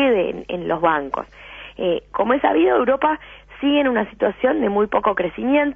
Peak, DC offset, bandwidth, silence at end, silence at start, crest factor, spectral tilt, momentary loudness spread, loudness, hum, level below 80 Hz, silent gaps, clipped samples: -2 dBFS; under 0.1%; 3.7 kHz; 0 s; 0 s; 18 dB; -8 dB/octave; 11 LU; -20 LUFS; 50 Hz at -50 dBFS; -50 dBFS; none; under 0.1%